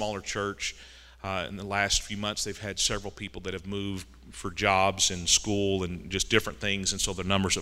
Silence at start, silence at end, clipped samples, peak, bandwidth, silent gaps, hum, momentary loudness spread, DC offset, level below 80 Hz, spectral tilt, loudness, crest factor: 0 s; 0 s; under 0.1%; -6 dBFS; 16 kHz; none; none; 14 LU; under 0.1%; -46 dBFS; -2.5 dB/octave; -28 LUFS; 24 dB